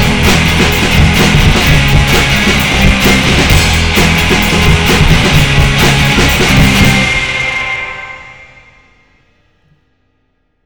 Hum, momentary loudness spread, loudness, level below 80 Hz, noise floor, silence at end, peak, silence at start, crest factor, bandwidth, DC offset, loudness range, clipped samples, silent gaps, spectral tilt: none; 5 LU; -8 LUFS; -16 dBFS; -60 dBFS; 0.7 s; 0 dBFS; 0 s; 10 dB; over 20 kHz; under 0.1%; 7 LU; 0.6%; none; -4 dB/octave